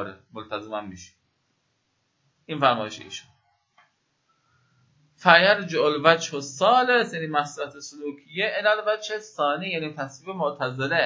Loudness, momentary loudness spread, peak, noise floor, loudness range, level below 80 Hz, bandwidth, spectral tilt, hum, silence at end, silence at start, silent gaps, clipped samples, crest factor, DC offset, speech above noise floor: -23 LUFS; 18 LU; 0 dBFS; -72 dBFS; 10 LU; -70 dBFS; 7.8 kHz; -4 dB/octave; none; 0 s; 0 s; none; under 0.1%; 26 dB; under 0.1%; 48 dB